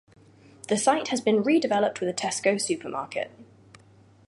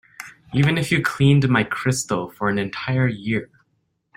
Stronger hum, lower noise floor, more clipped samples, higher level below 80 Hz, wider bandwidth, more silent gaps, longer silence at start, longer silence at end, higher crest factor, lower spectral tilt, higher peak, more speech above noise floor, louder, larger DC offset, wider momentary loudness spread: neither; second, -55 dBFS vs -70 dBFS; neither; second, -70 dBFS vs -50 dBFS; second, 11.5 kHz vs 16 kHz; neither; first, 0.7 s vs 0.2 s; first, 0.85 s vs 0.7 s; about the same, 20 dB vs 18 dB; second, -3.5 dB/octave vs -5.5 dB/octave; second, -8 dBFS vs -4 dBFS; second, 30 dB vs 50 dB; second, -25 LUFS vs -21 LUFS; neither; about the same, 11 LU vs 9 LU